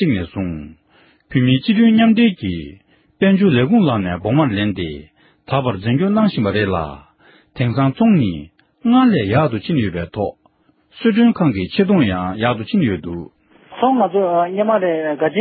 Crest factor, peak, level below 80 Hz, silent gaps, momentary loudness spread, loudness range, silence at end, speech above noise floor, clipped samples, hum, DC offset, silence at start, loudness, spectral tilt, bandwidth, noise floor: 16 dB; -2 dBFS; -42 dBFS; none; 12 LU; 3 LU; 0 s; 41 dB; under 0.1%; none; under 0.1%; 0 s; -16 LUFS; -12.5 dB/octave; 4.8 kHz; -57 dBFS